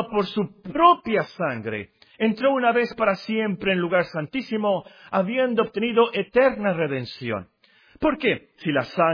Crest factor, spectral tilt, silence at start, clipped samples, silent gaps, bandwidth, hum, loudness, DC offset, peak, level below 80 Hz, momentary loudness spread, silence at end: 20 dB; -7.5 dB/octave; 0 s; under 0.1%; none; 5.2 kHz; none; -23 LUFS; under 0.1%; -2 dBFS; -56 dBFS; 10 LU; 0 s